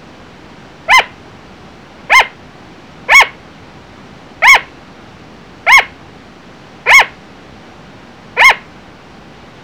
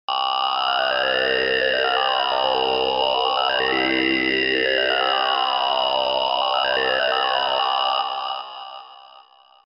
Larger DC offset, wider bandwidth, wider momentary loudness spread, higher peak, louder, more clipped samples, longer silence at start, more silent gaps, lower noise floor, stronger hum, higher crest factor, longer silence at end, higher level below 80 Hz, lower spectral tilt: first, 0.3% vs under 0.1%; first, over 20 kHz vs 6 kHz; first, 16 LU vs 3 LU; first, 0 dBFS vs -6 dBFS; first, -8 LUFS vs -20 LUFS; first, 0.3% vs under 0.1%; first, 0.9 s vs 0.1 s; neither; second, -37 dBFS vs -50 dBFS; neither; about the same, 14 dB vs 16 dB; first, 1.05 s vs 0.65 s; first, -44 dBFS vs -56 dBFS; second, -0.5 dB/octave vs -5 dB/octave